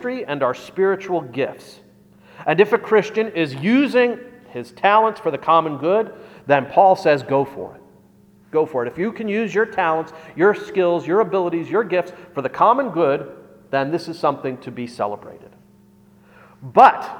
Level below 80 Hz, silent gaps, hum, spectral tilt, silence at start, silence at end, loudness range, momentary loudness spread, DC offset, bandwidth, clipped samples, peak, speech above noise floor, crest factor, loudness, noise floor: -64 dBFS; none; none; -6.5 dB/octave; 0 s; 0 s; 5 LU; 13 LU; under 0.1%; 13.5 kHz; under 0.1%; 0 dBFS; 33 dB; 20 dB; -19 LUFS; -51 dBFS